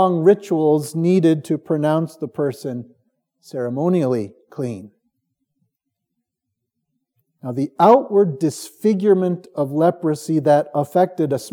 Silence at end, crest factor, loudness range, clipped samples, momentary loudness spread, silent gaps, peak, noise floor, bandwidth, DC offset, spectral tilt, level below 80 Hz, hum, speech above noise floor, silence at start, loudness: 0.05 s; 18 dB; 11 LU; under 0.1%; 14 LU; none; -2 dBFS; -79 dBFS; 17.5 kHz; under 0.1%; -7.5 dB/octave; -78 dBFS; none; 61 dB; 0 s; -19 LUFS